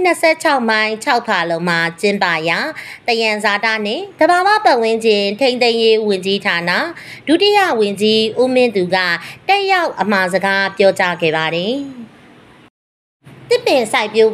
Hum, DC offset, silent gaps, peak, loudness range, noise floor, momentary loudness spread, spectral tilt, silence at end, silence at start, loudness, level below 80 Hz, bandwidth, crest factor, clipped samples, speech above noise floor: none; under 0.1%; 12.70-13.20 s; 0 dBFS; 4 LU; -43 dBFS; 6 LU; -4 dB/octave; 0 s; 0 s; -14 LUFS; -64 dBFS; 14 kHz; 14 dB; under 0.1%; 29 dB